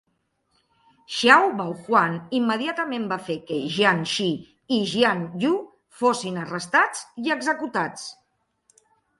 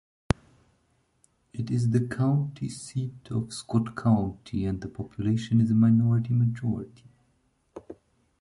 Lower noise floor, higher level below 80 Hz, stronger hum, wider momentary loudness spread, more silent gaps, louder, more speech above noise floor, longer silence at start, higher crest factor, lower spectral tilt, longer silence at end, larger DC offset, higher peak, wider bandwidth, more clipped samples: about the same, -72 dBFS vs -69 dBFS; second, -68 dBFS vs -50 dBFS; neither; second, 11 LU vs 14 LU; neither; first, -23 LUFS vs -27 LUFS; first, 49 dB vs 44 dB; second, 1.1 s vs 1.55 s; about the same, 24 dB vs 22 dB; second, -4 dB/octave vs -7.5 dB/octave; first, 1.05 s vs 0.5 s; neither; first, 0 dBFS vs -4 dBFS; about the same, 11.5 kHz vs 11.5 kHz; neither